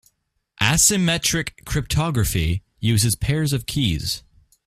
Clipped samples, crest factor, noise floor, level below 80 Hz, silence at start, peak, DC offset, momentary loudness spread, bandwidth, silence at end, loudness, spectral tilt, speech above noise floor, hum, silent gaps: under 0.1%; 20 dB; -68 dBFS; -36 dBFS; 0.6 s; -2 dBFS; under 0.1%; 10 LU; 16 kHz; 0.45 s; -20 LUFS; -3.5 dB/octave; 47 dB; none; none